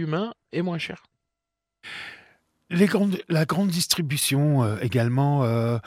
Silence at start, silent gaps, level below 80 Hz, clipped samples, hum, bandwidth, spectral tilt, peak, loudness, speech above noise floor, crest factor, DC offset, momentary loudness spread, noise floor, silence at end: 0 s; none; -64 dBFS; under 0.1%; none; 16 kHz; -5.5 dB/octave; -6 dBFS; -23 LUFS; 62 dB; 20 dB; under 0.1%; 16 LU; -85 dBFS; 0.05 s